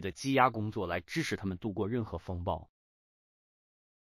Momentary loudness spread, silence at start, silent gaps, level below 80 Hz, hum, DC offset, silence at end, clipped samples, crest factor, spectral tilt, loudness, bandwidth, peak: 10 LU; 0 s; none; -56 dBFS; none; under 0.1%; 1.4 s; under 0.1%; 24 dB; -5.5 dB/octave; -33 LUFS; 15.5 kHz; -10 dBFS